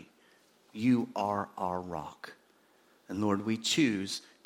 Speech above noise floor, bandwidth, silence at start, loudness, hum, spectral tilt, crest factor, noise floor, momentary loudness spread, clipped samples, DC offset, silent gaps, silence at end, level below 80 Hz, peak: 34 dB; 16.5 kHz; 0 s; -32 LUFS; none; -4.5 dB/octave; 18 dB; -66 dBFS; 17 LU; under 0.1%; under 0.1%; none; 0.25 s; -70 dBFS; -14 dBFS